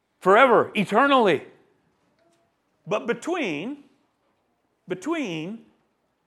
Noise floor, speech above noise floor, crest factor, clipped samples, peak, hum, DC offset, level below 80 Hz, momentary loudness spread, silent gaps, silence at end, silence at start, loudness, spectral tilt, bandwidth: -71 dBFS; 49 dB; 22 dB; under 0.1%; -2 dBFS; none; under 0.1%; -80 dBFS; 19 LU; none; 0.7 s; 0.25 s; -22 LUFS; -5.5 dB/octave; 13 kHz